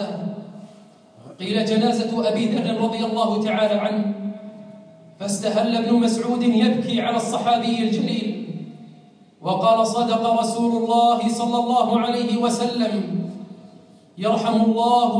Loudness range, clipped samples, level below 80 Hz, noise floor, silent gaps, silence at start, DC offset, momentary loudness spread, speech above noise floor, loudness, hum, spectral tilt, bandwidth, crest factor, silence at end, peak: 3 LU; under 0.1%; -74 dBFS; -49 dBFS; none; 0 s; under 0.1%; 14 LU; 29 dB; -21 LUFS; none; -5.5 dB/octave; 10.5 kHz; 14 dB; 0 s; -6 dBFS